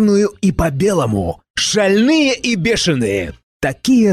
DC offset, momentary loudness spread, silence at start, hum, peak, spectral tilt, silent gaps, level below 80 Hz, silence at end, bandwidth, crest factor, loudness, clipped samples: under 0.1%; 9 LU; 0 s; none; -4 dBFS; -5 dB/octave; 1.50-1.54 s, 3.43-3.60 s; -36 dBFS; 0 s; 14 kHz; 10 dB; -15 LUFS; under 0.1%